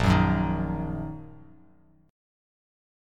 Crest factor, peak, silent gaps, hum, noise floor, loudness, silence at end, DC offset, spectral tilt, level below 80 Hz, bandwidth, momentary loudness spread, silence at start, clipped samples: 20 dB; -8 dBFS; none; none; -59 dBFS; -27 LUFS; 1.7 s; under 0.1%; -7.5 dB/octave; -40 dBFS; 11 kHz; 20 LU; 0 s; under 0.1%